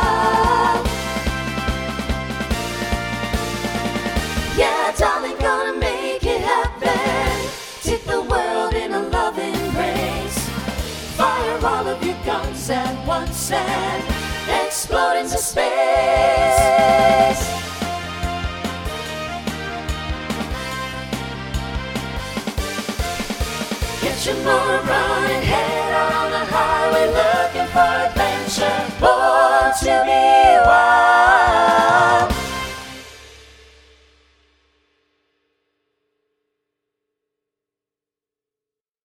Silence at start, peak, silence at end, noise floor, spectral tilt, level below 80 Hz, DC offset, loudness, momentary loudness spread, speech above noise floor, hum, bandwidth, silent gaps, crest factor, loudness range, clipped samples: 0 s; 0 dBFS; 5.65 s; -89 dBFS; -4 dB/octave; -32 dBFS; under 0.1%; -18 LUFS; 13 LU; 74 dB; none; 19 kHz; none; 18 dB; 12 LU; under 0.1%